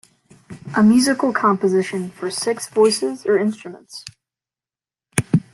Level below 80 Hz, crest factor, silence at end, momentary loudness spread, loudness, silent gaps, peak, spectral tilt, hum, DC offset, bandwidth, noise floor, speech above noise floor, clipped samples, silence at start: -60 dBFS; 20 dB; 0.15 s; 20 LU; -18 LUFS; none; 0 dBFS; -5 dB/octave; none; under 0.1%; 12.5 kHz; under -90 dBFS; over 72 dB; under 0.1%; 0.5 s